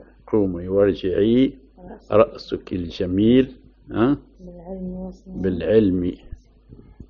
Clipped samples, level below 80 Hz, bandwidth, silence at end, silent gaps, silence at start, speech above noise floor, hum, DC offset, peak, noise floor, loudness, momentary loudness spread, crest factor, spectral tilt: under 0.1%; -44 dBFS; 6.4 kHz; 0.05 s; none; 0.3 s; 27 dB; none; under 0.1%; 0 dBFS; -47 dBFS; -21 LUFS; 15 LU; 20 dB; -7 dB/octave